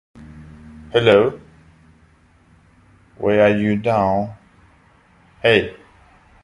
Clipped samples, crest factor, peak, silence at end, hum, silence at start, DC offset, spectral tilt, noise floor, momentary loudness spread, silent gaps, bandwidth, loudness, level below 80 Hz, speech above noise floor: under 0.1%; 20 dB; 0 dBFS; 0.7 s; none; 0.15 s; under 0.1%; -7 dB/octave; -53 dBFS; 17 LU; none; 11 kHz; -17 LUFS; -50 dBFS; 38 dB